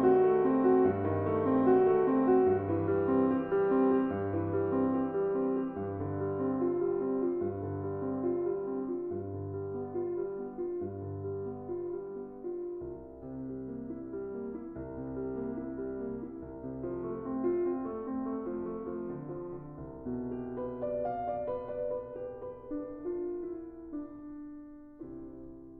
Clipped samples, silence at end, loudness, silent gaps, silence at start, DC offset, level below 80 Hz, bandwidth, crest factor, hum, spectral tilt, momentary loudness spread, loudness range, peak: under 0.1%; 0 s; -33 LUFS; none; 0 s; under 0.1%; -60 dBFS; 3.4 kHz; 18 dB; none; -9.5 dB/octave; 16 LU; 12 LU; -14 dBFS